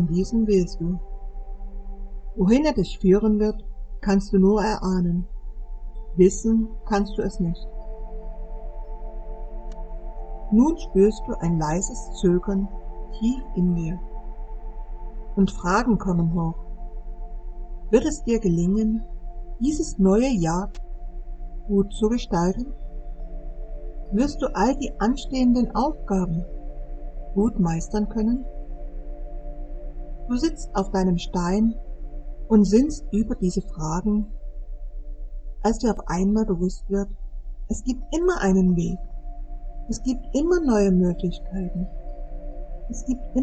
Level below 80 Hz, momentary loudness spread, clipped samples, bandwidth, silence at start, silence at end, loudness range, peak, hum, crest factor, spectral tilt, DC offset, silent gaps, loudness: -32 dBFS; 20 LU; under 0.1%; 8.8 kHz; 0 s; 0 s; 5 LU; -4 dBFS; none; 20 dB; -7 dB/octave; under 0.1%; none; -23 LUFS